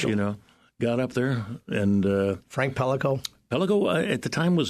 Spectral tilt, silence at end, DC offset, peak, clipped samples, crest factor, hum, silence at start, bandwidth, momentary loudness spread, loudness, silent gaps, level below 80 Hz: -6.5 dB/octave; 0 s; under 0.1%; -10 dBFS; under 0.1%; 16 dB; none; 0 s; 13.5 kHz; 8 LU; -26 LUFS; none; -58 dBFS